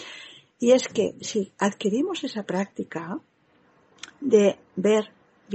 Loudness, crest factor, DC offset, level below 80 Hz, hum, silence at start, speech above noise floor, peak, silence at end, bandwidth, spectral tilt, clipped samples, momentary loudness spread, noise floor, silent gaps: -24 LUFS; 20 dB; under 0.1%; -74 dBFS; none; 0 s; 38 dB; -6 dBFS; 0 s; 8.6 kHz; -5 dB/octave; under 0.1%; 20 LU; -61 dBFS; none